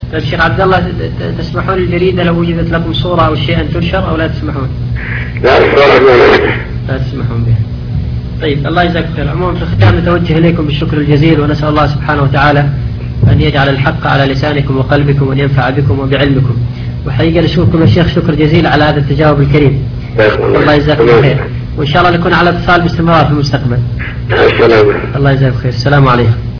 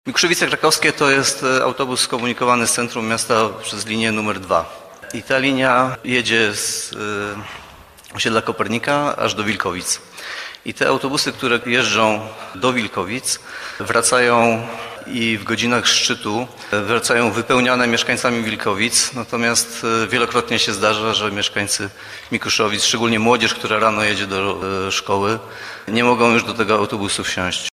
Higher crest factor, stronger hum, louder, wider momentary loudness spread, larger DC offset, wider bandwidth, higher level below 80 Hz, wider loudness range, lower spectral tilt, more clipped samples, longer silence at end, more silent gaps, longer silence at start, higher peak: second, 8 dB vs 18 dB; neither; first, -10 LUFS vs -17 LUFS; about the same, 10 LU vs 11 LU; neither; second, 5.4 kHz vs 15 kHz; first, -22 dBFS vs -54 dBFS; about the same, 3 LU vs 3 LU; first, -8 dB/octave vs -2.5 dB/octave; first, 1% vs under 0.1%; about the same, 0 s vs 0.05 s; neither; about the same, 0 s vs 0.05 s; about the same, 0 dBFS vs 0 dBFS